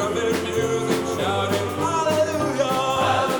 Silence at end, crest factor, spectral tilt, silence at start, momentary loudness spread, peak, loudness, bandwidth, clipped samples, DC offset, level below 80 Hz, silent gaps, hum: 0 s; 14 dB; -4.5 dB/octave; 0 s; 3 LU; -8 dBFS; -22 LUFS; over 20 kHz; under 0.1%; under 0.1%; -54 dBFS; none; none